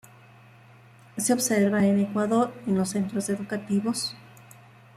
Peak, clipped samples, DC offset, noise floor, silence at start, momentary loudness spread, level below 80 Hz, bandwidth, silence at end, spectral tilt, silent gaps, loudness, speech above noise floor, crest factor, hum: -10 dBFS; under 0.1%; under 0.1%; -52 dBFS; 1.15 s; 9 LU; -68 dBFS; 15 kHz; 0.75 s; -5 dB/octave; none; -25 LUFS; 27 dB; 16 dB; none